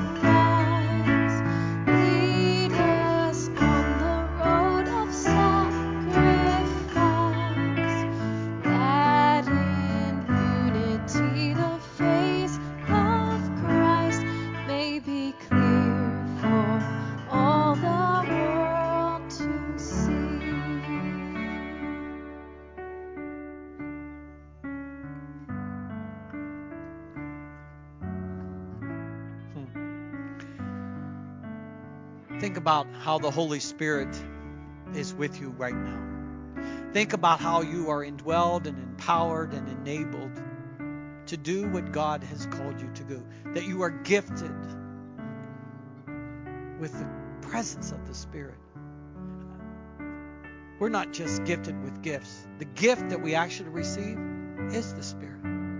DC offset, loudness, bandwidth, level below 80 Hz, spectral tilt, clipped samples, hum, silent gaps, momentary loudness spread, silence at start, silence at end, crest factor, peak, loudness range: under 0.1%; -26 LUFS; 7.6 kHz; -44 dBFS; -6 dB/octave; under 0.1%; none; none; 19 LU; 0 s; 0 s; 20 dB; -8 dBFS; 15 LU